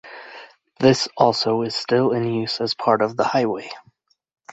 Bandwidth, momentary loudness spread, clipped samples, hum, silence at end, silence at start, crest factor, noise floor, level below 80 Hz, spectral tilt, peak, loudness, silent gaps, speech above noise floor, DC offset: 8.2 kHz; 20 LU; under 0.1%; none; 0 s; 0.05 s; 20 dB; -60 dBFS; -62 dBFS; -5 dB/octave; 0 dBFS; -20 LUFS; none; 40 dB; under 0.1%